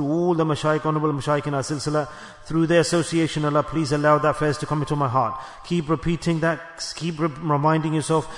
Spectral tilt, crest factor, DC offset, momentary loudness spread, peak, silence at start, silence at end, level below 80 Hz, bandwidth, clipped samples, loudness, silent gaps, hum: -6 dB/octave; 16 dB; under 0.1%; 8 LU; -6 dBFS; 0 s; 0 s; -48 dBFS; 11 kHz; under 0.1%; -22 LUFS; none; none